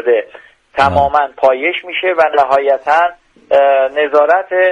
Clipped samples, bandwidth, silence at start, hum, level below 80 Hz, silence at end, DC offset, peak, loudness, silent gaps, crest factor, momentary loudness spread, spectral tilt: under 0.1%; 9 kHz; 0 s; none; -44 dBFS; 0 s; under 0.1%; 0 dBFS; -12 LUFS; none; 12 dB; 5 LU; -5.5 dB/octave